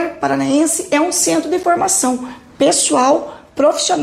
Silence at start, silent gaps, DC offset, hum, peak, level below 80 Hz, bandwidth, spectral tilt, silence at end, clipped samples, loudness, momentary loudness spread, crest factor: 0 s; none; under 0.1%; none; -4 dBFS; -54 dBFS; 16 kHz; -2.5 dB/octave; 0 s; under 0.1%; -15 LUFS; 6 LU; 12 dB